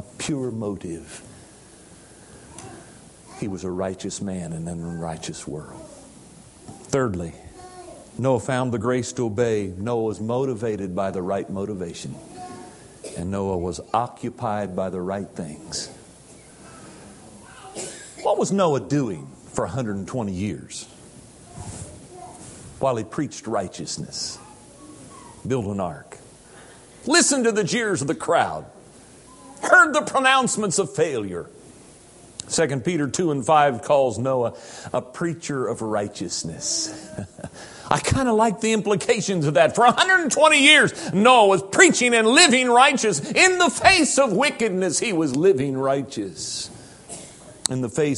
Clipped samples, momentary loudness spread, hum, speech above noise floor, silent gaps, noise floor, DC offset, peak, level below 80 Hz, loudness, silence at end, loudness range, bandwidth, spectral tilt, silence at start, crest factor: under 0.1%; 23 LU; none; 26 dB; none; -47 dBFS; under 0.1%; 0 dBFS; -50 dBFS; -21 LUFS; 0 s; 16 LU; 11.5 kHz; -3.5 dB/octave; 0 s; 22 dB